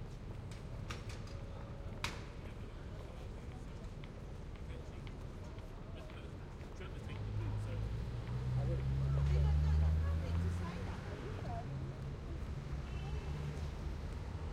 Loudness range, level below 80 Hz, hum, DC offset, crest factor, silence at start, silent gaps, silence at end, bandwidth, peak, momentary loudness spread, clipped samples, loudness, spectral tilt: 12 LU; -44 dBFS; none; under 0.1%; 20 dB; 0 s; none; 0 s; 11 kHz; -20 dBFS; 15 LU; under 0.1%; -42 LUFS; -7 dB/octave